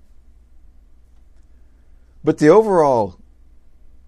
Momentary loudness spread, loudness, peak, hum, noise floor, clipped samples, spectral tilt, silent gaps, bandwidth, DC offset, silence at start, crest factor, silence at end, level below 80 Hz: 12 LU; -15 LUFS; 0 dBFS; 60 Hz at -50 dBFS; -47 dBFS; under 0.1%; -7 dB/octave; none; 11 kHz; under 0.1%; 2.25 s; 20 dB; 0.95 s; -48 dBFS